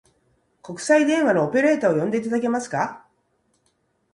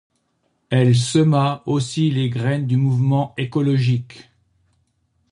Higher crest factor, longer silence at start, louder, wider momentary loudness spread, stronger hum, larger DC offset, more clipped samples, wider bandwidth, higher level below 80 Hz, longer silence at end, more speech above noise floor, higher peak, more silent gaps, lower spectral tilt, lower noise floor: about the same, 18 dB vs 16 dB; about the same, 0.65 s vs 0.7 s; about the same, -21 LUFS vs -19 LUFS; first, 10 LU vs 6 LU; neither; neither; neither; about the same, 11 kHz vs 11 kHz; second, -68 dBFS vs -56 dBFS; about the same, 1.15 s vs 1.1 s; about the same, 48 dB vs 50 dB; about the same, -6 dBFS vs -4 dBFS; neither; about the same, -5.5 dB/octave vs -6.5 dB/octave; about the same, -68 dBFS vs -68 dBFS